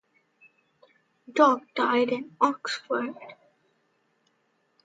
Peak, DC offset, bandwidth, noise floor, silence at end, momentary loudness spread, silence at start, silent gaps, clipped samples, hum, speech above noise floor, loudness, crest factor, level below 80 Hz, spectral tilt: -6 dBFS; under 0.1%; 9.4 kHz; -71 dBFS; 1.5 s; 14 LU; 1.3 s; none; under 0.1%; none; 46 dB; -25 LUFS; 24 dB; -84 dBFS; -4 dB/octave